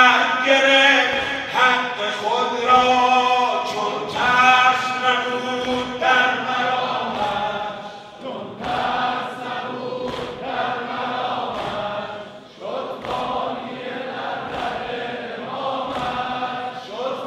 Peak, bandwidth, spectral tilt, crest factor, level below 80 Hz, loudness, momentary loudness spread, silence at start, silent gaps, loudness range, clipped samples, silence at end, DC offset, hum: -2 dBFS; 14 kHz; -3 dB/octave; 20 dB; -54 dBFS; -20 LUFS; 15 LU; 0 s; none; 10 LU; under 0.1%; 0 s; under 0.1%; none